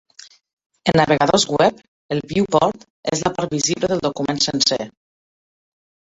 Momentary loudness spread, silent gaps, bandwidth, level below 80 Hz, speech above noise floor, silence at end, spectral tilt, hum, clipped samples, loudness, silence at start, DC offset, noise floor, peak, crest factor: 10 LU; 1.88-2.09 s, 2.90-3.03 s; 8.4 kHz; -52 dBFS; over 71 dB; 1.25 s; -4 dB/octave; none; under 0.1%; -19 LUFS; 0.85 s; under 0.1%; under -90 dBFS; 0 dBFS; 20 dB